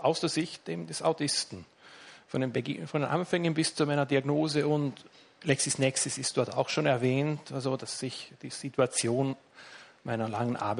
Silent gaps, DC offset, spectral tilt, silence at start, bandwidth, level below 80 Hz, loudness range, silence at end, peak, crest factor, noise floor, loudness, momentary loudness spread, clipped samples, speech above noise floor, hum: none; under 0.1%; -4.5 dB/octave; 0 s; 11 kHz; -72 dBFS; 4 LU; 0 s; -12 dBFS; 18 dB; -52 dBFS; -30 LUFS; 14 LU; under 0.1%; 22 dB; none